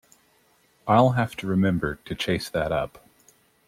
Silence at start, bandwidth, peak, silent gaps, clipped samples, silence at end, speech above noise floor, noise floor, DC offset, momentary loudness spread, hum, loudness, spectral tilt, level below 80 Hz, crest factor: 0.85 s; 15.5 kHz; -4 dBFS; none; under 0.1%; 0.8 s; 39 dB; -63 dBFS; under 0.1%; 11 LU; none; -24 LUFS; -6.5 dB/octave; -50 dBFS; 20 dB